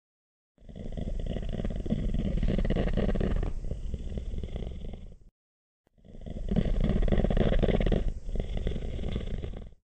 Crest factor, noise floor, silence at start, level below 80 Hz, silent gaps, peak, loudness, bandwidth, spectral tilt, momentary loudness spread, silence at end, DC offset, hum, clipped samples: 20 dB; under -90 dBFS; 0.6 s; -32 dBFS; 5.31-5.84 s; -10 dBFS; -32 LUFS; 7.8 kHz; -8.5 dB/octave; 14 LU; 0.15 s; under 0.1%; none; under 0.1%